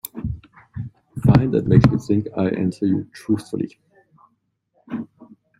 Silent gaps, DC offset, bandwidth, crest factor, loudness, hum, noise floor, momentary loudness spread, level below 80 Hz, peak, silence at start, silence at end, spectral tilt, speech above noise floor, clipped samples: none; under 0.1%; 16 kHz; 20 dB; -20 LUFS; none; -68 dBFS; 19 LU; -42 dBFS; -2 dBFS; 0.15 s; 0.55 s; -8.5 dB/octave; 49 dB; under 0.1%